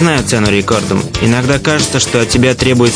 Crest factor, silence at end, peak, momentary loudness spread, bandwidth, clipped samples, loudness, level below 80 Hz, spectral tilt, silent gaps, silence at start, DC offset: 12 dB; 0 s; 0 dBFS; 3 LU; 10.5 kHz; under 0.1%; -11 LUFS; -32 dBFS; -4.5 dB/octave; none; 0 s; under 0.1%